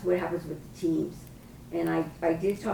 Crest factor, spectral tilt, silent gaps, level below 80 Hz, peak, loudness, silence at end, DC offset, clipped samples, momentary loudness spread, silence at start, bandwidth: 16 dB; -7 dB/octave; none; -54 dBFS; -14 dBFS; -30 LUFS; 0 s; under 0.1%; under 0.1%; 16 LU; 0 s; 20 kHz